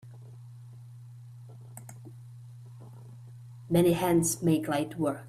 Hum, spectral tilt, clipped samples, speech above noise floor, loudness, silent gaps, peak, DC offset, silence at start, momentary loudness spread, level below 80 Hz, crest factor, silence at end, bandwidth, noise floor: none; -5.5 dB/octave; under 0.1%; 21 dB; -27 LUFS; none; -14 dBFS; under 0.1%; 0.05 s; 24 LU; -62 dBFS; 18 dB; 0 s; 15.5 kHz; -47 dBFS